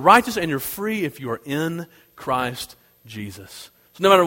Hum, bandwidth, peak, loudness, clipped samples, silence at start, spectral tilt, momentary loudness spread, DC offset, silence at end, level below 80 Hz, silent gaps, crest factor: none; 16.5 kHz; 0 dBFS; -22 LUFS; under 0.1%; 0 s; -4.5 dB/octave; 23 LU; under 0.1%; 0 s; -56 dBFS; none; 22 dB